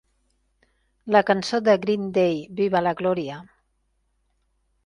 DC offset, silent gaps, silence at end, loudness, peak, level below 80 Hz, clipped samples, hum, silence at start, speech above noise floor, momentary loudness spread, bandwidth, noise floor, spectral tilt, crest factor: under 0.1%; none; 1.4 s; -22 LUFS; -2 dBFS; -62 dBFS; under 0.1%; none; 1.05 s; 49 dB; 11 LU; 11 kHz; -70 dBFS; -6 dB/octave; 22 dB